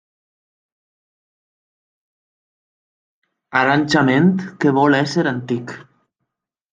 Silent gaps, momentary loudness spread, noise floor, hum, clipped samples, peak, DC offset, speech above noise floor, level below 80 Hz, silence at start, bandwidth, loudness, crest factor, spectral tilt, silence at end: none; 11 LU; -79 dBFS; none; under 0.1%; -2 dBFS; under 0.1%; 63 dB; -64 dBFS; 3.5 s; 9.2 kHz; -17 LUFS; 18 dB; -6.5 dB/octave; 0.9 s